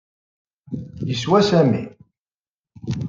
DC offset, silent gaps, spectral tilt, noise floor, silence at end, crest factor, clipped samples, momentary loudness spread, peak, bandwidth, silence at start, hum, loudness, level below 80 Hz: under 0.1%; 2.21-2.25 s, 2.34-2.64 s; -6.5 dB/octave; under -90 dBFS; 0 s; 18 dB; under 0.1%; 19 LU; -4 dBFS; 7.6 kHz; 0.7 s; none; -19 LUFS; -54 dBFS